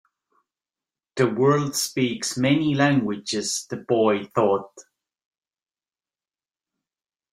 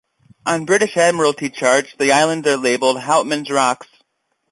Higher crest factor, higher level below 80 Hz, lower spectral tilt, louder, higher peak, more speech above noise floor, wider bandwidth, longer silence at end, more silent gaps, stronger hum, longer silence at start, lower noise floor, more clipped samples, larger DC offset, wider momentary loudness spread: about the same, 20 dB vs 16 dB; about the same, -66 dBFS vs -64 dBFS; first, -4.5 dB/octave vs -3 dB/octave; second, -22 LUFS vs -16 LUFS; second, -6 dBFS vs -2 dBFS; first, over 68 dB vs 53 dB; first, 16 kHz vs 11.5 kHz; first, 2.5 s vs 0.65 s; neither; neither; first, 1.15 s vs 0.45 s; first, under -90 dBFS vs -69 dBFS; neither; neither; about the same, 7 LU vs 6 LU